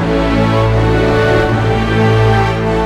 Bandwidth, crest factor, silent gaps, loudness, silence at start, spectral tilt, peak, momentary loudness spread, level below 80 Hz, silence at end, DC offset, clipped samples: 9.8 kHz; 10 dB; none; -12 LUFS; 0 s; -7 dB/octave; -2 dBFS; 3 LU; -22 dBFS; 0 s; under 0.1%; under 0.1%